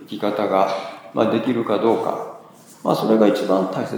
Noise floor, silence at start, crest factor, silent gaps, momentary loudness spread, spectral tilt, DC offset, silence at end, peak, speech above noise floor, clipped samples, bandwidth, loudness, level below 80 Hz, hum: -44 dBFS; 0 s; 18 dB; none; 12 LU; -6.5 dB/octave; under 0.1%; 0 s; -2 dBFS; 25 dB; under 0.1%; over 20 kHz; -20 LUFS; -76 dBFS; none